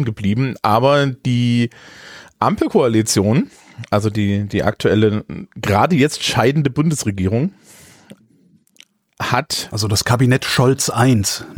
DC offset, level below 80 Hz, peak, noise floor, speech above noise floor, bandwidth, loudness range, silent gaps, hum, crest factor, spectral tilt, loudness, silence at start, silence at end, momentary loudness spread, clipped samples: under 0.1%; -48 dBFS; -2 dBFS; -54 dBFS; 38 dB; 18.5 kHz; 4 LU; none; none; 16 dB; -5 dB/octave; -17 LUFS; 0 s; 0 s; 8 LU; under 0.1%